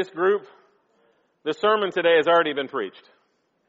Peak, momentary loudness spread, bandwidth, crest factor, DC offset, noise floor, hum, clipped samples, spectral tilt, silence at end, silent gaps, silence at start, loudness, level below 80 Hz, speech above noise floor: -6 dBFS; 13 LU; 7.6 kHz; 18 dB; under 0.1%; -69 dBFS; none; under 0.1%; -1.5 dB/octave; 0.8 s; none; 0 s; -22 LUFS; -76 dBFS; 47 dB